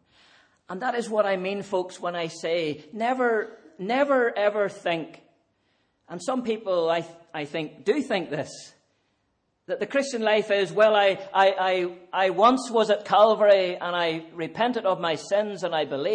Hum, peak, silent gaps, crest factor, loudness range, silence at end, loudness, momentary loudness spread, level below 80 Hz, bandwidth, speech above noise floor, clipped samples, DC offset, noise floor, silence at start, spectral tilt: none; -6 dBFS; none; 18 dB; 8 LU; 0 s; -24 LUFS; 13 LU; -76 dBFS; 9.8 kHz; 49 dB; under 0.1%; under 0.1%; -73 dBFS; 0.7 s; -4.5 dB/octave